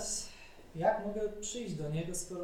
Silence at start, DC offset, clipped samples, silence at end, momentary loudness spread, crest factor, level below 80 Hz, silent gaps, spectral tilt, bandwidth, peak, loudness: 0 s; under 0.1%; under 0.1%; 0 s; 15 LU; 20 dB; -54 dBFS; none; -4 dB/octave; 16.5 kHz; -16 dBFS; -36 LUFS